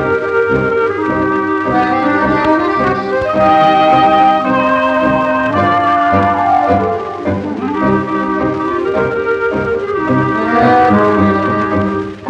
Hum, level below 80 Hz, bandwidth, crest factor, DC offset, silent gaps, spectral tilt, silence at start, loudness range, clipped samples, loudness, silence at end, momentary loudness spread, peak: none; -40 dBFS; 8.8 kHz; 12 dB; under 0.1%; none; -7.5 dB/octave; 0 s; 4 LU; under 0.1%; -12 LUFS; 0 s; 7 LU; 0 dBFS